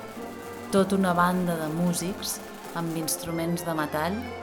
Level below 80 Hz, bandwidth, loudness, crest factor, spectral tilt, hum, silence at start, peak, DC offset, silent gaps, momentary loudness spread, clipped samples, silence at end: -58 dBFS; 19.5 kHz; -27 LUFS; 18 dB; -5 dB/octave; none; 0 s; -8 dBFS; under 0.1%; none; 13 LU; under 0.1%; 0 s